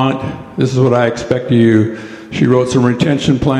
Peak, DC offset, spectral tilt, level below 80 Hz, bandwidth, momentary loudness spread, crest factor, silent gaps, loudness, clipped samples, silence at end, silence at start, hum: 0 dBFS; under 0.1%; -7 dB/octave; -40 dBFS; 10 kHz; 10 LU; 12 dB; none; -13 LUFS; under 0.1%; 0 s; 0 s; none